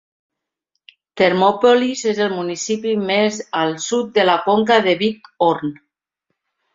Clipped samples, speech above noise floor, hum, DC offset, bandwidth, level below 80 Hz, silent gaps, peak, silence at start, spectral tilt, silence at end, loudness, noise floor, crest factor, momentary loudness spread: under 0.1%; 59 dB; none; under 0.1%; 7.8 kHz; -62 dBFS; none; -2 dBFS; 1.15 s; -4 dB/octave; 1 s; -17 LUFS; -76 dBFS; 18 dB; 8 LU